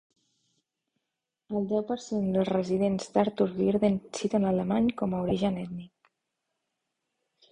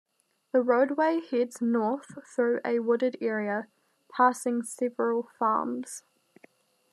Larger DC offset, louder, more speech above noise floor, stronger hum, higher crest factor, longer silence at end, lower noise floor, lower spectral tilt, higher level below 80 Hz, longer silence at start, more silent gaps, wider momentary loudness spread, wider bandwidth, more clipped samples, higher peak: neither; about the same, -28 LUFS vs -28 LUFS; first, 59 dB vs 34 dB; neither; about the same, 20 dB vs 18 dB; first, 1.65 s vs 0.95 s; first, -86 dBFS vs -61 dBFS; first, -7 dB/octave vs -5 dB/octave; first, -58 dBFS vs under -90 dBFS; first, 1.5 s vs 0.55 s; neither; second, 7 LU vs 12 LU; second, 10 kHz vs 13 kHz; neither; about the same, -10 dBFS vs -10 dBFS